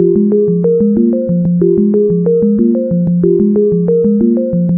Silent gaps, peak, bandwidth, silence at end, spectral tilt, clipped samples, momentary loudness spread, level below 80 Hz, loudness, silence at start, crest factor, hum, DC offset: none; 0 dBFS; 1.7 kHz; 0 s; -16 dB/octave; under 0.1%; 2 LU; -42 dBFS; -11 LUFS; 0 s; 10 dB; none; under 0.1%